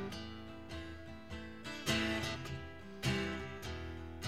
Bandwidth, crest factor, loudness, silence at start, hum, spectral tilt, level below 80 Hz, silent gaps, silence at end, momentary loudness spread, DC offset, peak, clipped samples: 16.5 kHz; 20 dB; -41 LUFS; 0 s; none; -4.5 dB/octave; -54 dBFS; none; 0 s; 14 LU; 0.2%; -22 dBFS; under 0.1%